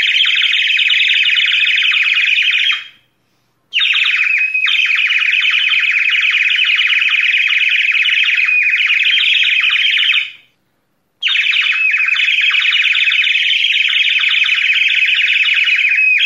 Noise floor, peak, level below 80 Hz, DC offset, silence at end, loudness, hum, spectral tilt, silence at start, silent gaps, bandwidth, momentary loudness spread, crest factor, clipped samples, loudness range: -64 dBFS; -2 dBFS; -76 dBFS; under 0.1%; 0 s; -10 LUFS; none; 4.5 dB/octave; 0 s; none; 13 kHz; 2 LU; 12 dB; under 0.1%; 2 LU